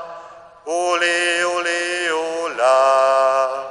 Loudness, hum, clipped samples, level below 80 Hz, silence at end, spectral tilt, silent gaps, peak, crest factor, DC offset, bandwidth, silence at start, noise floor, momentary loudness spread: -17 LUFS; none; under 0.1%; -68 dBFS; 0 s; -0.5 dB/octave; none; -4 dBFS; 14 dB; under 0.1%; 11 kHz; 0 s; -40 dBFS; 11 LU